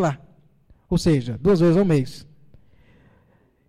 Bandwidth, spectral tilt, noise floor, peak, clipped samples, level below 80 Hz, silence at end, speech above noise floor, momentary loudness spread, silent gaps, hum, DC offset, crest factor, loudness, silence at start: 12 kHz; -7.5 dB/octave; -60 dBFS; -10 dBFS; under 0.1%; -42 dBFS; 1.45 s; 41 dB; 17 LU; none; none; under 0.1%; 12 dB; -20 LUFS; 0 s